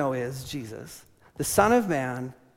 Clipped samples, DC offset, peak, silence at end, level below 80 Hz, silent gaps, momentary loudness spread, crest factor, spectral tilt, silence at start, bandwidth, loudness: under 0.1%; under 0.1%; -6 dBFS; 0.25 s; -54 dBFS; none; 21 LU; 22 dB; -5 dB/octave; 0 s; 16.5 kHz; -26 LUFS